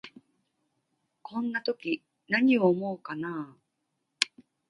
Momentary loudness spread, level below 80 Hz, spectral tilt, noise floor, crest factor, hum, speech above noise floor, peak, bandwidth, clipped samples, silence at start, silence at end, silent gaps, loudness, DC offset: 14 LU; -80 dBFS; -4.5 dB/octave; -80 dBFS; 30 dB; none; 53 dB; 0 dBFS; 10.5 kHz; under 0.1%; 0.05 s; 0.4 s; none; -29 LUFS; under 0.1%